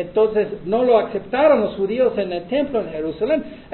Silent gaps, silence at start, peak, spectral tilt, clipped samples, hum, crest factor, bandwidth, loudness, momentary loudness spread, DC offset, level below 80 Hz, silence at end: none; 0 s; -4 dBFS; -10.5 dB/octave; under 0.1%; none; 16 dB; 4.3 kHz; -19 LUFS; 8 LU; under 0.1%; -50 dBFS; 0 s